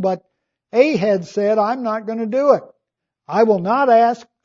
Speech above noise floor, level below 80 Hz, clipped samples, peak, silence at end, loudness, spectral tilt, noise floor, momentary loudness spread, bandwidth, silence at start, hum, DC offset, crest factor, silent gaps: 62 dB; -72 dBFS; under 0.1%; 0 dBFS; 0.2 s; -17 LUFS; -7 dB/octave; -79 dBFS; 9 LU; 7.4 kHz; 0 s; none; under 0.1%; 18 dB; none